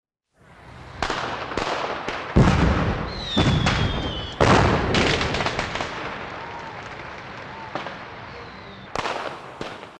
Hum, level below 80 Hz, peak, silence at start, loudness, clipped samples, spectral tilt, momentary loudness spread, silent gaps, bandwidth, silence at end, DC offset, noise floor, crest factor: none; -34 dBFS; -2 dBFS; 0.5 s; -23 LUFS; under 0.1%; -5.5 dB/octave; 18 LU; none; 10.5 kHz; 0 s; under 0.1%; -55 dBFS; 22 dB